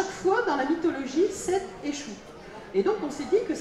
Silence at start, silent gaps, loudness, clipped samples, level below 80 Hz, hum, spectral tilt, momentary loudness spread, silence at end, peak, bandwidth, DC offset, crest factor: 0 s; none; -27 LUFS; under 0.1%; -58 dBFS; none; -4.5 dB/octave; 14 LU; 0 s; -12 dBFS; 12.5 kHz; under 0.1%; 14 dB